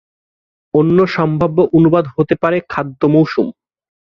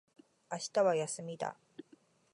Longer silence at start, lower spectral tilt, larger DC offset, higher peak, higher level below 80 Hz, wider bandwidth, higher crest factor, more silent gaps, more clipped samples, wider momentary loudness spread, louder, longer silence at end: first, 0.75 s vs 0.5 s; first, -9.5 dB/octave vs -4 dB/octave; neither; first, -2 dBFS vs -18 dBFS; first, -48 dBFS vs -88 dBFS; second, 6.4 kHz vs 11.5 kHz; second, 14 dB vs 20 dB; neither; neither; second, 7 LU vs 24 LU; first, -14 LUFS vs -35 LUFS; first, 0.65 s vs 0.5 s